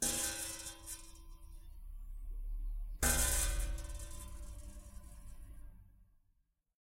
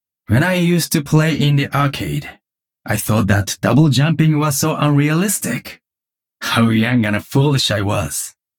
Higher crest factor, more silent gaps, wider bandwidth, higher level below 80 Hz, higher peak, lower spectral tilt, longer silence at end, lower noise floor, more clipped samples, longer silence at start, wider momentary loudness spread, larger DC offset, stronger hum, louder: first, 22 dB vs 14 dB; neither; second, 16 kHz vs 18.5 kHz; about the same, -44 dBFS vs -46 dBFS; second, -18 dBFS vs -2 dBFS; second, -2 dB/octave vs -5 dB/octave; first, 0.9 s vs 0.3 s; second, -77 dBFS vs -87 dBFS; neither; second, 0 s vs 0.3 s; first, 24 LU vs 9 LU; neither; neither; second, -38 LUFS vs -16 LUFS